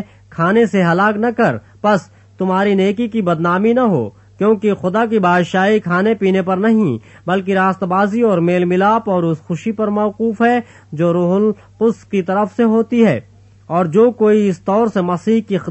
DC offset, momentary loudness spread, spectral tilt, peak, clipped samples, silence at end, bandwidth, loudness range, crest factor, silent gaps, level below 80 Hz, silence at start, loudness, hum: under 0.1%; 6 LU; -7.5 dB/octave; -2 dBFS; under 0.1%; 0 s; 8.4 kHz; 1 LU; 14 dB; none; -56 dBFS; 0 s; -15 LUFS; none